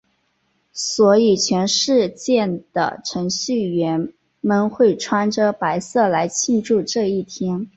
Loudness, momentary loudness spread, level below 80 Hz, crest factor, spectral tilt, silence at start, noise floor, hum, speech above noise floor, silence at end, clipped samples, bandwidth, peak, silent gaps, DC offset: -19 LUFS; 9 LU; -60 dBFS; 16 dB; -4 dB/octave; 0.75 s; -66 dBFS; none; 48 dB; 0.1 s; under 0.1%; 8.2 kHz; -2 dBFS; none; under 0.1%